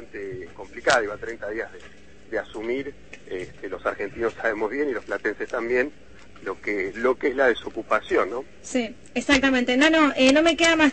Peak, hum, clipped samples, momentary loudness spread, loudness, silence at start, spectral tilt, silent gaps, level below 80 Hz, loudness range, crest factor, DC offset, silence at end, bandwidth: -6 dBFS; none; under 0.1%; 17 LU; -23 LUFS; 0 s; -3 dB/octave; none; -52 dBFS; 9 LU; 18 dB; 0.5%; 0 s; 8.8 kHz